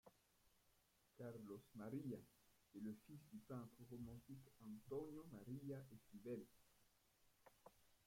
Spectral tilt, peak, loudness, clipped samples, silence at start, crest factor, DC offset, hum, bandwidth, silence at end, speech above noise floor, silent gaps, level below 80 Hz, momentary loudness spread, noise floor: -7.5 dB/octave; -40 dBFS; -57 LUFS; under 0.1%; 0.05 s; 18 dB; under 0.1%; none; 16.5 kHz; 0.05 s; 25 dB; none; -82 dBFS; 9 LU; -80 dBFS